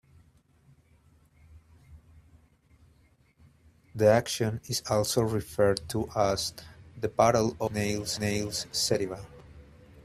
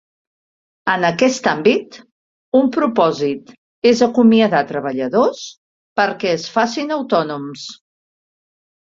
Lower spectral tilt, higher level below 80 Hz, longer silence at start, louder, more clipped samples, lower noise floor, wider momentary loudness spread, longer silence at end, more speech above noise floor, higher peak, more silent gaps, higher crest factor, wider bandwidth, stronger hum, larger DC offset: about the same, -4.5 dB/octave vs -5 dB/octave; about the same, -56 dBFS vs -60 dBFS; first, 1.55 s vs 0.85 s; second, -28 LUFS vs -17 LUFS; neither; second, -63 dBFS vs under -90 dBFS; about the same, 13 LU vs 13 LU; second, 0.05 s vs 1.05 s; second, 36 dB vs over 74 dB; second, -8 dBFS vs 0 dBFS; second, none vs 2.12-2.52 s, 3.58-3.82 s, 5.57-5.96 s; first, 22 dB vs 16 dB; first, 15 kHz vs 7.8 kHz; neither; neither